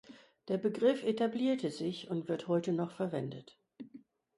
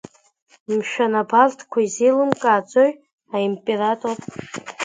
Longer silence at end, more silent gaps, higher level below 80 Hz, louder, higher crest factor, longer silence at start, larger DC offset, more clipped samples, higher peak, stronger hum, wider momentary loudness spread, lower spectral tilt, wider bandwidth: first, 0.4 s vs 0 s; second, none vs 3.13-3.18 s; second, -80 dBFS vs -66 dBFS; second, -34 LUFS vs -19 LUFS; about the same, 18 dB vs 20 dB; second, 0.1 s vs 0.7 s; neither; neither; second, -18 dBFS vs 0 dBFS; neither; first, 22 LU vs 12 LU; first, -7 dB/octave vs -4.5 dB/octave; first, 11.5 kHz vs 9.4 kHz